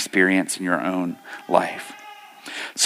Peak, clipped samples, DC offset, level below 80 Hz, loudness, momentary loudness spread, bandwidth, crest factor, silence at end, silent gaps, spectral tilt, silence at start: -2 dBFS; under 0.1%; under 0.1%; -76 dBFS; -22 LUFS; 21 LU; 16 kHz; 22 dB; 0 s; none; -3 dB/octave; 0 s